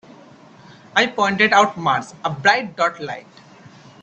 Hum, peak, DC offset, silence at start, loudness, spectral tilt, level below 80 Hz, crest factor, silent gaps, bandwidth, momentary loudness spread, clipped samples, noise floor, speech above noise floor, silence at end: none; 0 dBFS; under 0.1%; 0.95 s; -18 LUFS; -3.5 dB/octave; -64 dBFS; 20 dB; none; 8.6 kHz; 15 LU; under 0.1%; -45 dBFS; 27 dB; 0.35 s